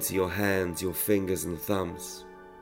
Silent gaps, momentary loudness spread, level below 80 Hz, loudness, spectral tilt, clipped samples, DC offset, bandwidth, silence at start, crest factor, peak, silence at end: none; 13 LU; -58 dBFS; -29 LUFS; -4.5 dB/octave; under 0.1%; under 0.1%; 16 kHz; 0 s; 18 dB; -12 dBFS; 0 s